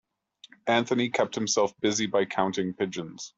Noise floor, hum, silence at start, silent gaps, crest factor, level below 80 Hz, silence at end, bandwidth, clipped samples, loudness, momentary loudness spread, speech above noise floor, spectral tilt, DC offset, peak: -56 dBFS; none; 0.65 s; none; 20 dB; -70 dBFS; 0.1 s; 8.2 kHz; under 0.1%; -27 LUFS; 7 LU; 29 dB; -3.5 dB/octave; under 0.1%; -8 dBFS